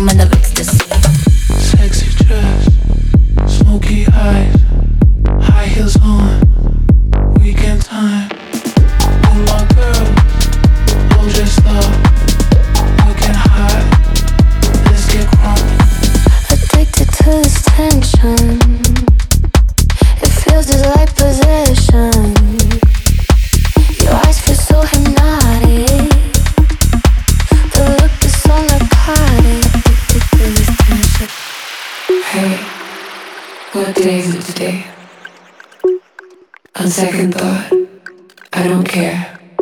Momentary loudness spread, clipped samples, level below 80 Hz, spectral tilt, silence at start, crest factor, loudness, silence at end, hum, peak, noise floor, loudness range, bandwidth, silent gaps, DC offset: 7 LU; under 0.1%; -10 dBFS; -5.5 dB/octave; 0 s; 8 dB; -11 LUFS; 0 s; none; 0 dBFS; -42 dBFS; 7 LU; 19 kHz; none; under 0.1%